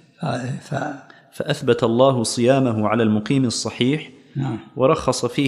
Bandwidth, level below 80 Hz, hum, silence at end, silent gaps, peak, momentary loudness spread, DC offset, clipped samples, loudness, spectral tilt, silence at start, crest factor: 13 kHz; -54 dBFS; none; 0 s; none; -2 dBFS; 11 LU; under 0.1%; under 0.1%; -20 LUFS; -5.5 dB/octave; 0.2 s; 18 dB